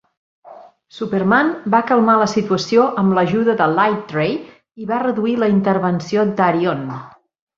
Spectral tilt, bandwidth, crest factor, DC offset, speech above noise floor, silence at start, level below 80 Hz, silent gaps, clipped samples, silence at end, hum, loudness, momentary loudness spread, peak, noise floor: -6.5 dB/octave; 7.4 kHz; 16 dB; under 0.1%; 25 dB; 0.45 s; -58 dBFS; none; under 0.1%; 0.5 s; none; -17 LUFS; 9 LU; -2 dBFS; -42 dBFS